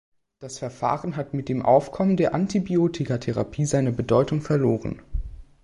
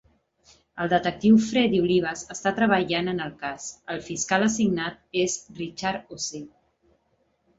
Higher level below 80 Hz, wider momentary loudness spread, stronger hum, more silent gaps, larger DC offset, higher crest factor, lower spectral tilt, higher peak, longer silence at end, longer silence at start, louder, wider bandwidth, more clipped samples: first, -42 dBFS vs -58 dBFS; about the same, 15 LU vs 14 LU; neither; neither; neither; about the same, 18 dB vs 20 dB; first, -7 dB/octave vs -4.5 dB/octave; about the same, -6 dBFS vs -6 dBFS; second, 0.2 s vs 1.1 s; second, 0.4 s vs 0.75 s; about the same, -23 LUFS vs -25 LUFS; first, 11.5 kHz vs 8 kHz; neither